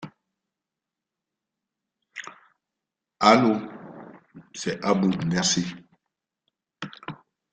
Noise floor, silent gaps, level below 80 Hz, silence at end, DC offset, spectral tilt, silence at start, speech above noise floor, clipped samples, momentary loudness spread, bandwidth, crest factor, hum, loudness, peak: -87 dBFS; none; -64 dBFS; 0.4 s; under 0.1%; -4 dB/octave; 0 s; 66 dB; under 0.1%; 25 LU; 9.6 kHz; 26 dB; none; -22 LUFS; -2 dBFS